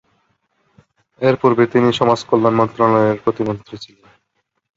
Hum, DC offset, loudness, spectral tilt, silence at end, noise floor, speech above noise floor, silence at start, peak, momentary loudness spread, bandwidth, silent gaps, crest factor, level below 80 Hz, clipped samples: none; under 0.1%; -16 LUFS; -7 dB/octave; 0.9 s; -70 dBFS; 55 dB; 1.2 s; -2 dBFS; 10 LU; 7.8 kHz; none; 16 dB; -54 dBFS; under 0.1%